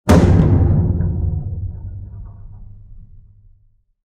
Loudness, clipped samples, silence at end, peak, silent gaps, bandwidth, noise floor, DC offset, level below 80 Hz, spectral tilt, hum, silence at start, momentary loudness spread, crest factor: -16 LUFS; under 0.1%; 1.1 s; 0 dBFS; none; 13 kHz; -55 dBFS; under 0.1%; -26 dBFS; -8 dB/octave; none; 0.05 s; 23 LU; 18 dB